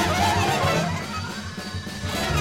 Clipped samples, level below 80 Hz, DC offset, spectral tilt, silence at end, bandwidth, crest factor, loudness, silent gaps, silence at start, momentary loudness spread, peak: under 0.1%; -42 dBFS; 0.2%; -4.5 dB/octave; 0 s; 16.5 kHz; 16 dB; -25 LUFS; none; 0 s; 11 LU; -8 dBFS